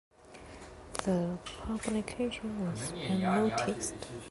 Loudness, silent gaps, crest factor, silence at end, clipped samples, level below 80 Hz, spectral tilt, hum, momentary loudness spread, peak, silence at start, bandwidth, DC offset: -34 LUFS; none; 20 dB; 0 s; under 0.1%; -54 dBFS; -5 dB/octave; none; 20 LU; -14 dBFS; 0.2 s; 12 kHz; under 0.1%